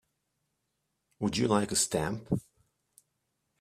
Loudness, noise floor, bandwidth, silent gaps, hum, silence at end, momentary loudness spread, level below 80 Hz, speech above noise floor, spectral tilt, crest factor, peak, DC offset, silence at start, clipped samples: -30 LUFS; -81 dBFS; 15.5 kHz; none; none; 1.2 s; 9 LU; -60 dBFS; 52 dB; -4 dB/octave; 22 dB; -12 dBFS; under 0.1%; 1.2 s; under 0.1%